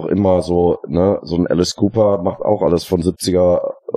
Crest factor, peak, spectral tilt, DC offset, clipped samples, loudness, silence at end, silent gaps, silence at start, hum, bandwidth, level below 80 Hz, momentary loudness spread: 14 dB; -2 dBFS; -6.5 dB/octave; under 0.1%; under 0.1%; -16 LUFS; 0 s; none; 0 s; none; 15 kHz; -44 dBFS; 4 LU